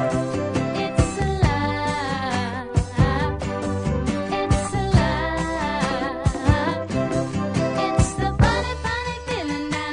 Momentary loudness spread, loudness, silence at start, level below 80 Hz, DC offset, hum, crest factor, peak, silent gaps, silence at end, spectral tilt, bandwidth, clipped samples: 6 LU; -23 LUFS; 0 s; -30 dBFS; under 0.1%; none; 18 dB; -2 dBFS; none; 0 s; -6 dB/octave; 10.5 kHz; under 0.1%